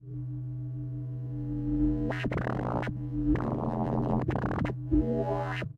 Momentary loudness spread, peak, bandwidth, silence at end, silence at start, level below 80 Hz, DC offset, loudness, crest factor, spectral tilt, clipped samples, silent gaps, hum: 8 LU; -14 dBFS; 6.6 kHz; 0.05 s; 0 s; -40 dBFS; under 0.1%; -31 LUFS; 18 dB; -9 dB/octave; under 0.1%; none; none